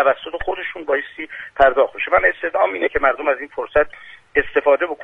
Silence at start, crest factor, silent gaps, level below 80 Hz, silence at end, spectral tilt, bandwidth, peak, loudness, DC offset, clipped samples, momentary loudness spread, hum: 0 s; 18 dB; none; -42 dBFS; 0 s; -6 dB/octave; 3.9 kHz; 0 dBFS; -19 LUFS; under 0.1%; under 0.1%; 9 LU; none